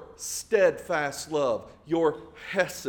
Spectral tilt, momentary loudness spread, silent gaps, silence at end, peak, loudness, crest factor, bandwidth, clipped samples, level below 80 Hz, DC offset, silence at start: -3.5 dB/octave; 10 LU; none; 0 s; -10 dBFS; -27 LUFS; 18 dB; 18 kHz; under 0.1%; -60 dBFS; under 0.1%; 0 s